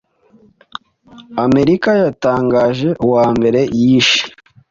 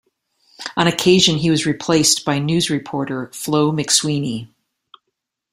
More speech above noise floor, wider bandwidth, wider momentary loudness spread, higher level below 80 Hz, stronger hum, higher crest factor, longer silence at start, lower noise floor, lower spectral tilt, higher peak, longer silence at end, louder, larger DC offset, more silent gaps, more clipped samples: second, 37 dB vs 60 dB; second, 7.6 kHz vs 16 kHz; first, 18 LU vs 12 LU; first, -46 dBFS vs -54 dBFS; neither; about the same, 14 dB vs 18 dB; first, 1.15 s vs 0.6 s; second, -50 dBFS vs -77 dBFS; first, -5.5 dB/octave vs -3.5 dB/octave; about the same, 0 dBFS vs 0 dBFS; second, 0.4 s vs 1.05 s; first, -13 LUFS vs -17 LUFS; neither; neither; neither